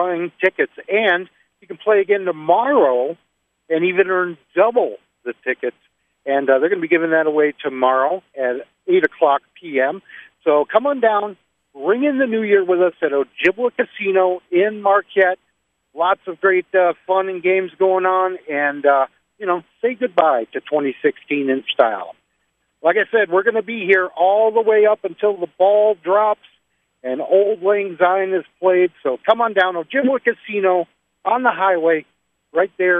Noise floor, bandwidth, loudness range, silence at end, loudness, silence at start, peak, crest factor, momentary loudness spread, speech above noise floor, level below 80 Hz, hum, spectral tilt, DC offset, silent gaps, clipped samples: -69 dBFS; 3.8 kHz; 3 LU; 0 s; -18 LUFS; 0 s; 0 dBFS; 18 dB; 8 LU; 52 dB; -72 dBFS; none; -7 dB/octave; under 0.1%; none; under 0.1%